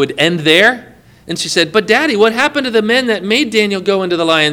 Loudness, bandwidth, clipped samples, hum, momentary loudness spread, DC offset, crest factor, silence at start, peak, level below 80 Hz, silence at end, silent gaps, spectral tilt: -12 LUFS; 18 kHz; 0.2%; none; 6 LU; under 0.1%; 12 dB; 0 s; 0 dBFS; -54 dBFS; 0 s; none; -3.5 dB/octave